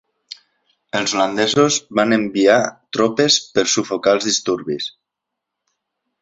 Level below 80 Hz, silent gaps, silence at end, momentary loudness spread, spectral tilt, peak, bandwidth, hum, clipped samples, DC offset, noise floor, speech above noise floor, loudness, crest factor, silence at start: -60 dBFS; none; 1.35 s; 12 LU; -3 dB/octave; -2 dBFS; 8 kHz; none; under 0.1%; under 0.1%; -81 dBFS; 64 dB; -17 LUFS; 18 dB; 0.95 s